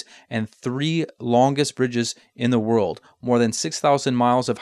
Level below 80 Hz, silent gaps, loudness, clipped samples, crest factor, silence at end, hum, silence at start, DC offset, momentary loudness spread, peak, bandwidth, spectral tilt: -64 dBFS; none; -22 LUFS; under 0.1%; 16 dB; 0 s; none; 0.3 s; under 0.1%; 9 LU; -6 dBFS; 12.5 kHz; -5 dB/octave